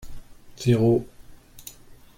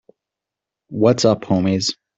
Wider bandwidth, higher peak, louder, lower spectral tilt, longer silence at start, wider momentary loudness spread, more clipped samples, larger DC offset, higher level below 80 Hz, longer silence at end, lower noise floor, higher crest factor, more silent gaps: first, 16.5 kHz vs 8.2 kHz; second, -8 dBFS vs -2 dBFS; second, -22 LUFS vs -17 LUFS; first, -7.5 dB/octave vs -5.5 dB/octave; second, 0 s vs 0.9 s; first, 23 LU vs 6 LU; neither; neither; first, -48 dBFS vs -56 dBFS; first, 0.5 s vs 0.25 s; second, -45 dBFS vs -85 dBFS; about the same, 18 dB vs 18 dB; neither